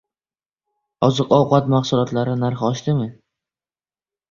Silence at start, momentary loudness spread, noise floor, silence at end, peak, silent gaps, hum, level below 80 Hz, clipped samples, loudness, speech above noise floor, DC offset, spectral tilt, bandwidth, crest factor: 1 s; 7 LU; under -90 dBFS; 1.2 s; -2 dBFS; none; none; -54 dBFS; under 0.1%; -19 LUFS; over 72 dB; under 0.1%; -7 dB/octave; 7.2 kHz; 18 dB